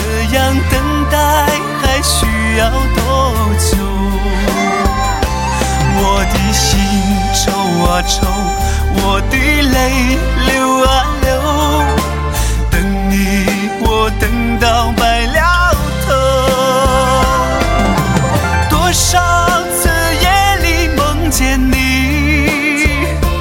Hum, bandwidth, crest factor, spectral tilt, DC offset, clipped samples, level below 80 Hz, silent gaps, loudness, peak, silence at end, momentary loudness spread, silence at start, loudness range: none; 17 kHz; 12 dB; -4.5 dB/octave; under 0.1%; under 0.1%; -18 dBFS; none; -12 LUFS; 0 dBFS; 0 s; 4 LU; 0 s; 2 LU